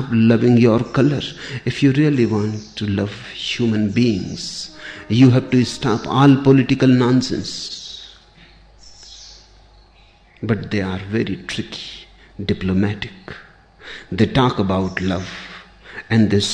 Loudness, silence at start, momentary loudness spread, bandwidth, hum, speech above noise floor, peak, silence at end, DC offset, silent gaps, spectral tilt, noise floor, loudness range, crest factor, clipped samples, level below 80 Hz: -18 LUFS; 0 s; 22 LU; 9.8 kHz; none; 33 dB; -2 dBFS; 0 s; under 0.1%; none; -6.5 dB/octave; -50 dBFS; 11 LU; 16 dB; under 0.1%; -46 dBFS